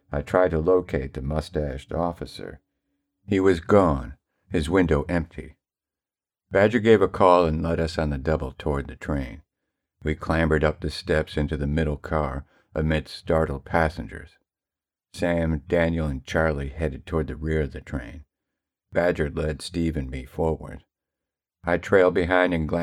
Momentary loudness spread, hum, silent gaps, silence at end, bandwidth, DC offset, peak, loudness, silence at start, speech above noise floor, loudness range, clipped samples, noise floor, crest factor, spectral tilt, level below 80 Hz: 15 LU; none; none; 0 s; 13 kHz; under 0.1%; -2 dBFS; -24 LUFS; 0.1 s; over 67 dB; 6 LU; under 0.1%; under -90 dBFS; 22 dB; -7 dB/octave; -36 dBFS